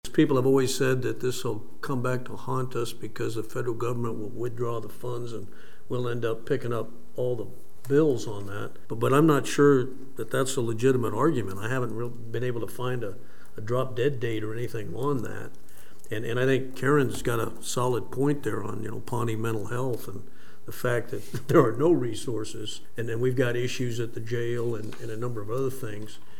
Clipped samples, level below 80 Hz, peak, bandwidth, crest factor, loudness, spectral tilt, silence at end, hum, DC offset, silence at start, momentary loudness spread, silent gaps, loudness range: under 0.1%; -58 dBFS; -6 dBFS; 17 kHz; 22 dB; -28 LUFS; -6 dB/octave; 0.25 s; none; 3%; 0 s; 14 LU; none; 7 LU